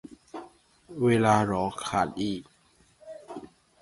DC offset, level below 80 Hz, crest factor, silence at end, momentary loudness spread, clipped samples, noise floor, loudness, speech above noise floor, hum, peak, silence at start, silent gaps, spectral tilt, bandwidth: under 0.1%; -58 dBFS; 22 dB; 0.35 s; 22 LU; under 0.1%; -63 dBFS; -26 LUFS; 38 dB; none; -6 dBFS; 0.1 s; none; -6 dB/octave; 11.5 kHz